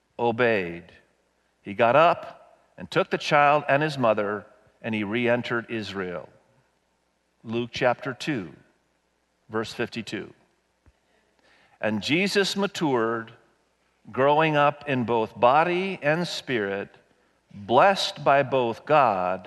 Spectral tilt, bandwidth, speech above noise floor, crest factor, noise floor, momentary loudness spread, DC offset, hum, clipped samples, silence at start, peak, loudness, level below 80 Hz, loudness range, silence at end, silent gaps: -5 dB/octave; 12 kHz; 47 dB; 20 dB; -70 dBFS; 16 LU; under 0.1%; none; under 0.1%; 0.2 s; -4 dBFS; -24 LUFS; -68 dBFS; 9 LU; 0 s; none